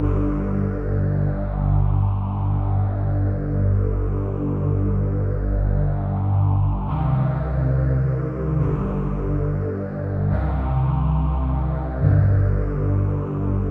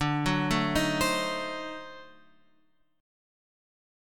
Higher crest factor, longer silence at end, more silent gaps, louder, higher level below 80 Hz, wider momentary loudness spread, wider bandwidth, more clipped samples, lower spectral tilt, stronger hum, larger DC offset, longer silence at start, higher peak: second, 14 dB vs 20 dB; second, 0 s vs 1 s; neither; first, -22 LUFS vs -28 LUFS; first, -26 dBFS vs -50 dBFS; second, 4 LU vs 16 LU; second, 3.1 kHz vs 17.5 kHz; neither; first, -12 dB/octave vs -4.5 dB/octave; first, 50 Hz at -35 dBFS vs none; neither; about the same, 0 s vs 0 s; first, -6 dBFS vs -12 dBFS